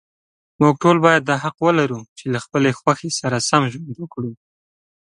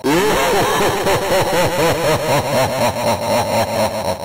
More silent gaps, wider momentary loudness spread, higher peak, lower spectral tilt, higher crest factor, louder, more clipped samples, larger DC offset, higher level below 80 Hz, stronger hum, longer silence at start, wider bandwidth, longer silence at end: first, 2.09-2.16 s vs none; first, 15 LU vs 3 LU; first, 0 dBFS vs -10 dBFS; about the same, -5 dB/octave vs -4 dB/octave; first, 20 dB vs 6 dB; about the same, -18 LUFS vs -16 LUFS; neither; neither; second, -60 dBFS vs -40 dBFS; neither; first, 0.6 s vs 0 s; second, 11.5 kHz vs 16 kHz; first, 0.7 s vs 0 s